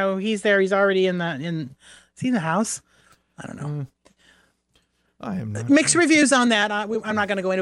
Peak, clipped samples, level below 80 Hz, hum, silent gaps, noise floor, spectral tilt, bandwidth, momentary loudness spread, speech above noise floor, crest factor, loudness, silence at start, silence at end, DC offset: -6 dBFS; under 0.1%; -64 dBFS; none; none; -66 dBFS; -4 dB/octave; 12 kHz; 17 LU; 45 dB; 18 dB; -21 LUFS; 0 s; 0 s; under 0.1%